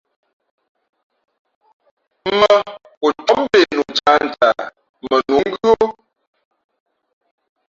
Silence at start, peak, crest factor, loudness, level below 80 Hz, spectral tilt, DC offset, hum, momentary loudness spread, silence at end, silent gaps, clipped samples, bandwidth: 2.25 s; -2 dBFS; 18 dB; -16 LUFS; -56 dBFS; -4 dB/octave; under 0.1%; none; 12 LU; 1.8 s; 2.97-3.01 s, 4.89-4.94 s; under 0.1%; 7.6 kHz